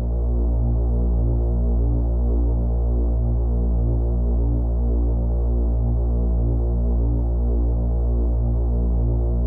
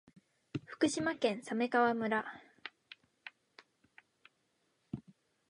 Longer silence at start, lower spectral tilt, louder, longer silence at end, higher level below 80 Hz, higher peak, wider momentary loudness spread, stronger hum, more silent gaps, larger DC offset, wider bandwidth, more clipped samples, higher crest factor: second, 0 s vs 0.55 s; first, -14 dB/octave vs -4.5 dB/octave; first, -22 LUFS vs -34 LUFS; second, 0 s vs 0.5 s; first, -20 dBFS vs -76 dBFS; first, -12 dBFS vs -16 dBFS; second, 1 LU vs 23 LU; first, 60 Hz at -35 dBFS vs none; neither; first, 0.2% vs under 0.1%; second, 1.4 kHz vs 11 kHz; neither; second, 8 dB vs 22 dB